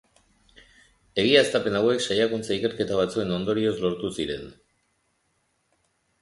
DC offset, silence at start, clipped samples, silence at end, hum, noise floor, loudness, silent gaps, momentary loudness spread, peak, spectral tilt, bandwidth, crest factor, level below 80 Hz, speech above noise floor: under 0.1%; 1.15 s; under 0.1%; 1.7 s; none; -71 dBFS; -24 LUFS; none; 12 LU; -6 dBFS; -4.5 dB/octave; 11.5 kHz; 22 dB; -56 dBFS; 47 dB